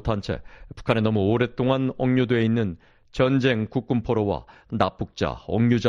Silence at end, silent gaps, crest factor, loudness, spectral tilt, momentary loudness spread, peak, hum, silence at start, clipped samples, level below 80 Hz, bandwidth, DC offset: 0 s; none; 18 dB; -24 LUFS; -8 dB/octave; 11 LU; -4 dBFS; none; 0.05 s; under 0.1%; -46 dBFS; 7.6 kHz; under 0.1%